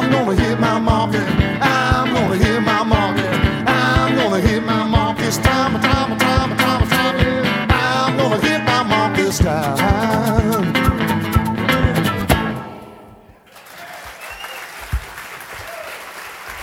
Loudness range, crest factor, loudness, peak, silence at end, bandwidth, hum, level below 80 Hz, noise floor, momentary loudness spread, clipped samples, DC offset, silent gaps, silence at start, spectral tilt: 10 LU; 18 dB; -16 LUFS; 0 dBFS; 0 s; 19 kHz; none; -30 dBFS; -44 dBFS; 15 LU; under 0.1%; under 0.1%; none; 0 s; -5.5 dB/octave